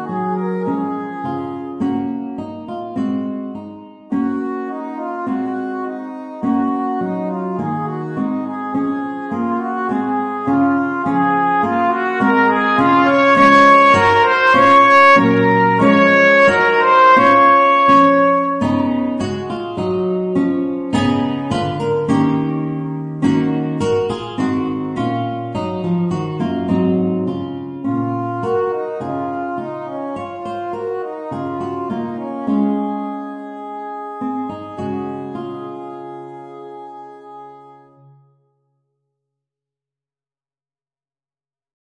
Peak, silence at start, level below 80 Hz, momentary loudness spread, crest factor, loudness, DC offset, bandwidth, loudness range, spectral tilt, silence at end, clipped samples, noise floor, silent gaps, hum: 0 dBFS; 0 s; -54 dBFS; 17 LU; 16 dB; -16 LUFS; under 0.1%; 9.8 kHz; 14 LU; -6.5 dB/octave; 4.15 s; under 0.1%; under -90 dBFS; none; none